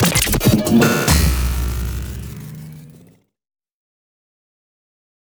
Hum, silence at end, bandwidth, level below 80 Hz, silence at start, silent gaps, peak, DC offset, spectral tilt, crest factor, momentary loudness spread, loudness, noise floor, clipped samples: none; 2.45 s; over 20 kHz; -26 dBFS; 0 s; none; 0 dBFS; under 0.1%; -4.5 dB/octave; 18 dB; 20 LU; -16 LUFS; -50 dBFS; under 0.1%